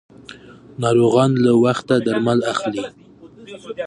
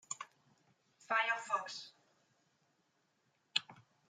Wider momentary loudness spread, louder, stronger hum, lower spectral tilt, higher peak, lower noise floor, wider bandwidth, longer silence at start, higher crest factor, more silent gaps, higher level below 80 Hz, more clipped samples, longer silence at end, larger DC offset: first, 20 LU vs 16 LU; first, -17 LUFS vs -38 LUFS; neither; first, -6.5 dB/octave vs 0.5 dB/octave; first, -2 dBFS vs -14 dBFS; second, -42 dBFS vs -79 dBFS; about the same, 11 kHz vs 11 kHz; first, 0.3 s vs 0.1 s; second, 16 dB vs 30 dB; neither; first, -58 dBFS vs under -90 dBFS; neither; second, 0 s vs 0.3 s; neither